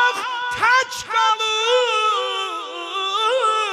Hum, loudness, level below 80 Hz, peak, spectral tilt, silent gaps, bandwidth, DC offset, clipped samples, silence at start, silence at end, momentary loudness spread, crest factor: none; -19 LUFS; -64 dBFS; -6 dBFS; 0 dB/octave; none; 14.5 kHz; under 0.1%; under 0.1%; 0 s; 0 s; 8 LU; 14 dB